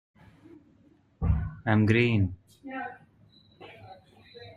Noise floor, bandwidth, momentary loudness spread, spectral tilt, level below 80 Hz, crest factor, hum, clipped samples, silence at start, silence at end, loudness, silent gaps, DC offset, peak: -62 dBFS; 7.2 kHz; 26 LU; -8.5 dB/octave; -42 dBFS; 20 dB; none; under 0.1%; 1.2 s; 0.05 s; -27 LUFS; none; under 0.1%; -10 dBFS